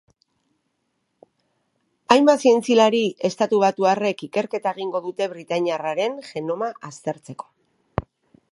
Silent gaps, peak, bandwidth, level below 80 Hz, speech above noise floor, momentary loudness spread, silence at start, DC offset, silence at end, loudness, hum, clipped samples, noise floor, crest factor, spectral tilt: none; 0 dBFS; 11.5 kHz; -54 dBFS; 52 dB; 15 LU; 2.1 s; under 0.1%; 0.5 s; -21 LUFS; none; under 0.1%; -73 dBFS; 22 dB; -5 dB/octave